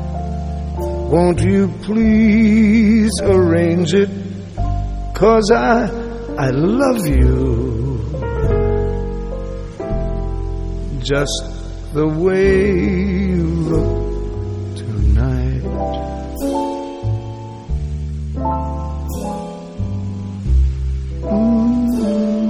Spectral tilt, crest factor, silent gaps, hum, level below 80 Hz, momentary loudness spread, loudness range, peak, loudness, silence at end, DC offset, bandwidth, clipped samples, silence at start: -7 dB/octave; 14 dB; none; none; -24 dBFS; 12 LU; 9 LU; -2 dBFS; -17 LUFS; 0 s; under 0.1%; 12 kHz; under 0.1%; 0 s